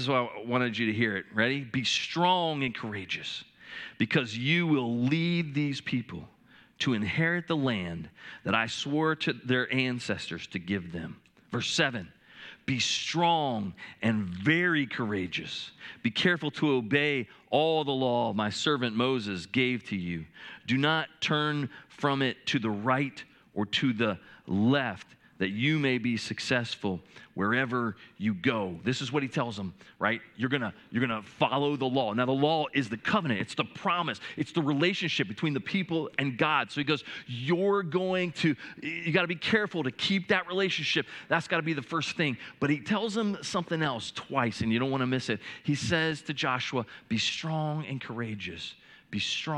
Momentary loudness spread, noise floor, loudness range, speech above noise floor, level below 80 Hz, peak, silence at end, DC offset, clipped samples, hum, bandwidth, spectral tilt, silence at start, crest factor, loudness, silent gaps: 10 LU; -50 dBFS; 3 LU; 21 dB; -70 dBFS; -8 dBFS; 0 s; under 0.1%; under 0.1%; none; 11 kHz; -5 dB/octave; 0 s; 22 dB; -29 LUFS; none